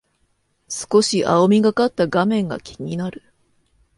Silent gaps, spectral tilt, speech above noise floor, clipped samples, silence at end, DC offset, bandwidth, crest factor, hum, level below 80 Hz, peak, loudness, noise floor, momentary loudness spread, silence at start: none; -5 dB/octave; 48 dB; under 0.1%; 0.8 s; under 0.1%; 11.5 kHz; 18 dB; none; -56 dBFS; -2 dBFS; -19 LUFS; -66 dBFS; 14 LU; 0.7 s